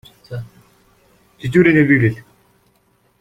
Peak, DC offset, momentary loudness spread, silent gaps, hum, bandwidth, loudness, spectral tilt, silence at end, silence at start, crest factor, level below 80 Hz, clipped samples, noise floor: -2 dBFS; under 0.1%; 20 LU; none; none; 14 kHz; -14 LUFS; -8.5 dB/octave; 1 s; 0.3 s; 18 dB; -50 dBFS; under 0.1%; -59 dBFS